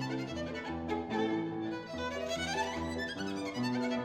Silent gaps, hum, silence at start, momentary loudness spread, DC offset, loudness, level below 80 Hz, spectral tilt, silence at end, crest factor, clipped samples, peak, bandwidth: none; none; 0 s; 5 LU; under 0.1%; -36 LUFS; -56 dBFS; -5 dB/octave; 0 s; 14 dB; under 0.1%; -22 dBFS; 15 kHz